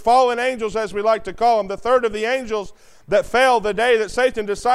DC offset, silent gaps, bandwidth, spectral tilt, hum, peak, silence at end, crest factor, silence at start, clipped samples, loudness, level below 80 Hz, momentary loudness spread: under 0.1%; none; 13 kHz; -3.5 dB/octave; none; -4 dBFS; 0 s; 14 dB; 0 s; under 0.1%; -19 LUFS; -44 dBFS; 8 LU